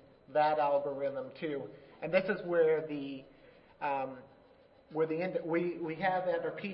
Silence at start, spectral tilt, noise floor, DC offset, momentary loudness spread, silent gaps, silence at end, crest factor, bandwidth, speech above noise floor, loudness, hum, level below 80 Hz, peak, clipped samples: 0.3 s; -9.5 dB/octave; -62 dBFS; under 0.1%; 14 LU; none; 0 s; 18 dB; 5.6 kHz; 29 dB; -34 LUFS; none; -72 dBFS; -16 dBFS; under 0.1%